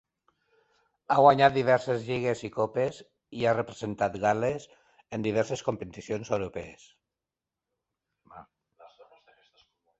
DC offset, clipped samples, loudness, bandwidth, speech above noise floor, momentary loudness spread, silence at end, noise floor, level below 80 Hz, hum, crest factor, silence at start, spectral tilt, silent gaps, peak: under 0.1%; under 0.1%; -27 LUFS; 8.2 kHz; 63 dB; 17 LU; 0.95 s; -89 dBFS; -62 dBFS; none; 24 dB; 1.1 s; -6 dB/octave; none; -6 dBFS